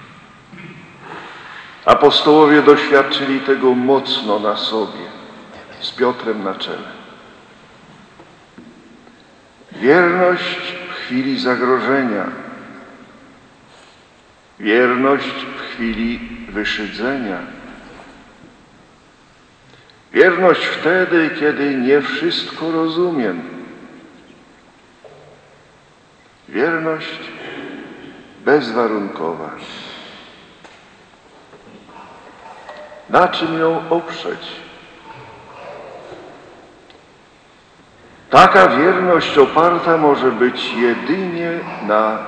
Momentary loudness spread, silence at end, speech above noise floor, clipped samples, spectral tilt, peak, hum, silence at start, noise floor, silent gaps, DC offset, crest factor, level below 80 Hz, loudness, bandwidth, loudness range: 25 LU; 0 s; 34 dB; under 0.1%; -5.5 dB/octave; 0 dBFS; none; 0 s; -49 dBFS; none; under 0.1%; 18 dB; -54 dBFS; -15 LUFS; 8.8 kHz; 15 LU